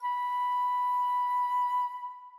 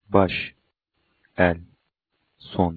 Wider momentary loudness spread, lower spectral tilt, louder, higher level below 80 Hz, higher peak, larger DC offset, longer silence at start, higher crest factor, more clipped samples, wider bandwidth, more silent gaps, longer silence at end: second, 4 LU vs 14 LU; second, 7 dB/octave vs -9.5 dB/octave; second, -29 LUFS vs -24 LUFS; second, under -90 dBFS vs -50 dBFS; second, -24 dBFS vs -2 dBFS; neither; about the same, 0 s vs 0.1 s; second, 6 dB vs 24 dB; neither; first, 13.5 kHz vs 4.8 kHz; neither; about the same, 0 s vs 0 s